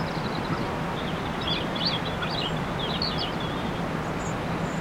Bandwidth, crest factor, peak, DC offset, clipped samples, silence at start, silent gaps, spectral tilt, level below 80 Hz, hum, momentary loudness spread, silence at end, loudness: 16.5 kHz; 14 dB; -14 dBFS; under 0.1%; under 0.1%; 0 s; none; -5.5 dB/octave; -44 dBFS; none; 4 LU; 0 s; -28 LUFS